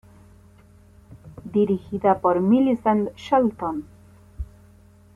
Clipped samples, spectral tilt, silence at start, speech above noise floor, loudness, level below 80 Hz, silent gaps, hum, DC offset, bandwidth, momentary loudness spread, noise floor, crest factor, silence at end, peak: under 0.1%; -8.5 dB/octave; 1.1 s; 31 dB; -22 LUFS; -48 dBFS; none; none; under 0.1%; 11 kHz; 20 LU; -51 dBFS; 16 dB; 0.7 s; -8 dBFS